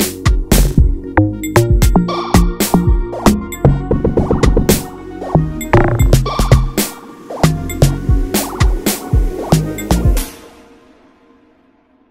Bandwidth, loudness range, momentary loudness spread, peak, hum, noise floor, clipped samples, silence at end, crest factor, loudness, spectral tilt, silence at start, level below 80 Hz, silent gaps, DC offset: 16.5 kHz; 4 LU; 5 LU; 0 dBFS; none; -52 dBFS; 0.1%; 1.65 s; 14 dB; -14 LUFS; -5.5 dB/octave; 0 s; -18 dBFS; none; under 0.1%